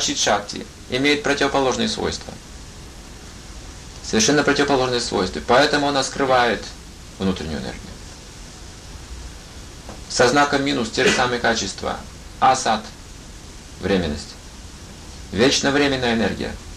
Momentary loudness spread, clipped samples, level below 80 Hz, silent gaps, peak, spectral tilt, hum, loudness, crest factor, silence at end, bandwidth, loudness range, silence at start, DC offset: 22 LU; under 0.1%; -40 dBFS; none; -4 dBFS; -3.5 dB/octave; none; -19 LUFS; 18 dB; 0 s; 14.5 kHz; 6 LU; 0 s; under 0.1%